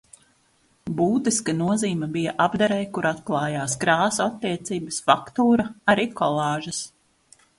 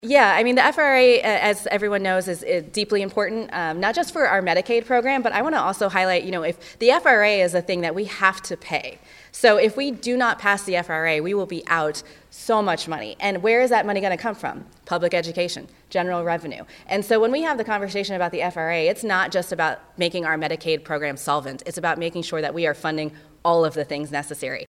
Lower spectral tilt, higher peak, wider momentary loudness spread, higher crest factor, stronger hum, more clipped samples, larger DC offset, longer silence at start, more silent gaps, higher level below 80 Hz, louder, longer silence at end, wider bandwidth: about the same, -4.5 dB/octave vs -4 dB/octave; about the same, -2 dBFS vs -2 dBFS; second, 8 LU vs 11 LU; about the same, 22 dB vs 20 dB; neither; neither; neither; first, 0.85 s vs 0.05 s; neither; about the same, -58 dBFS vs -60 dBFS; about the same, -23 LUFS vs -21 LUFS; first, 0.7 s vs 0.05 s; second, 11.5 kHz vs 15.5 kHz